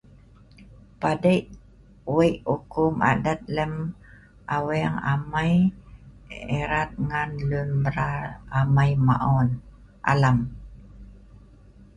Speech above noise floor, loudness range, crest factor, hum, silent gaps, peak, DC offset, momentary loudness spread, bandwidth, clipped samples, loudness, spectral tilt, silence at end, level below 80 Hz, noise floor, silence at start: 28 dB; 3 LU; 20 dB; none; none; -4 dBFS; under 0.1%; 12 LU; 11 kHz; under 0.1%; -24 LUFS; -8 dB/octave; 0.1 s; -44 dBFS; -51 dBFS; 0.6 s